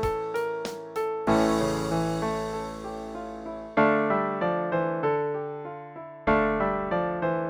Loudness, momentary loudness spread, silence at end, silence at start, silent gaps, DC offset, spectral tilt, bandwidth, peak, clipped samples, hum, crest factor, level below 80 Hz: -27 LUFS; 14 LU; 0 s; 0 s; none; under 0.1%; -6 dB/octave; over 20 kHz; -8 dBFS; under 0.1%; none; 18 dB; -48 dBFS